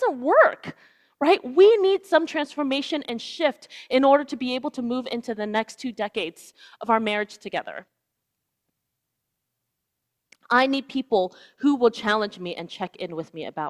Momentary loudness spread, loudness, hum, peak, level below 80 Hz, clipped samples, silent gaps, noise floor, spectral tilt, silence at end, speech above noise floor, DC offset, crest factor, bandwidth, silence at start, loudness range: 16 LU; -23 LUFS; none; -4 dBFS; -70 dBFS; under 0.1%; none; -80 dBFS; -4.5 dB/octave; 0 s; 57 dB; under 0.1%; 20 dB; 12.5 kHz; 0 s; 9 LU